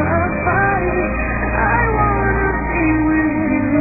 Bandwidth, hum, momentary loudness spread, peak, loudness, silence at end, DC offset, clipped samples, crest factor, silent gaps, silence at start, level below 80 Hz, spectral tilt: 2.7 kHz; none; 3 LU; -2 dBFS; -17 LUFS; 0 s; under 0.1%; under 0.1%; 14 dB; none; 0 s; -26 dBFS; -14 dB/octave